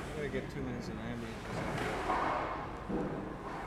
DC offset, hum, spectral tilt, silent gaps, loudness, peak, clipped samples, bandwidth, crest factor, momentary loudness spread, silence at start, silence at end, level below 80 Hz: under 0.1%; none; -6 dB/octave; none; -38 LUFS; -22 dBFS; under 0.1%; 16 kHz; 16 dB; 8 LU; 0 s; 0 s; -50 dBFS